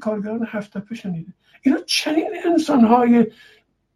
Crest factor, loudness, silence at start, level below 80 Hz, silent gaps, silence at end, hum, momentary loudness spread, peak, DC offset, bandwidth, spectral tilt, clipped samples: 16 dB; -19 LUFS; 0 s; -62 dBFS; none; 0.65 s; none; 16 LU; -2 dBFS; under 0.1%; 13.5 kHz; -5 dB/octave; under 0.1%